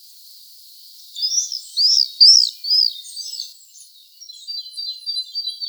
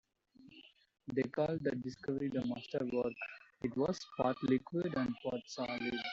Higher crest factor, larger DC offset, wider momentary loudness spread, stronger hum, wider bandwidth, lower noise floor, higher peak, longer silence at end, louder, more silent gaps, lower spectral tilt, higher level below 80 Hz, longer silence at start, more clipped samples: about the same, 20 dB vs 18 dB; neither; first, 21 LU vs 8 LU; neither; first, over 20 kHz vs 7.6 kHz; second, -45 dBFS vs -63 dBFS; first, 0 dBFS vs -20 dBFS; about the same, 0 s vs 0 s; first, -14 LUFS vs -38 LUFS; neither; second, 12.5 dB/octave vs -5 dB/octave; second, under -90 dBFS vs -68 dBFS; first, 1.15 s vs 0.4 s; neither